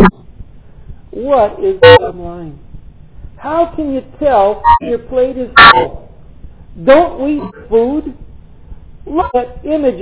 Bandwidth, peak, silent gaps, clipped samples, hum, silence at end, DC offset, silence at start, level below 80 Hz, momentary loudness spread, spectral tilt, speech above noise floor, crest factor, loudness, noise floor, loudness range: 4 kHz; 0 dBFS; none; 3%; none; 0 s; 0.9%; 0 s; -32 dBFS; 19 LU; -9 dB/octave; 24 dB; 12 dB; -10 LUFS; -34 dBFS; 6 LU